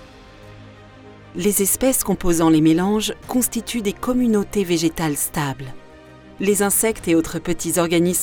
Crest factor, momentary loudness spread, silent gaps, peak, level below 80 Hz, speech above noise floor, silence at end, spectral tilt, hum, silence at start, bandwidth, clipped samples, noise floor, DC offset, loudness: 14 dB; 8 LU; none; -6 dBFS; -40 dBFS; 24 dB; 0 s; -4.5 dB/octave; none; 0 s; over 20 kHz; under 0.1%; -43 dBFS; under 0.1%; -19 LUFS